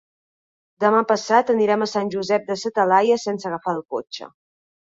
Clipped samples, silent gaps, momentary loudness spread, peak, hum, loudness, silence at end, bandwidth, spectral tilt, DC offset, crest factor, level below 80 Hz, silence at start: under 0.1%; none; 11 LU; -4 dBFS; none; -20 LUFS; 0.7 s; 7.8 kHz; -4.5 dB/octave; under 0.1%; 18 dB; -68 dBFS; 0.8 s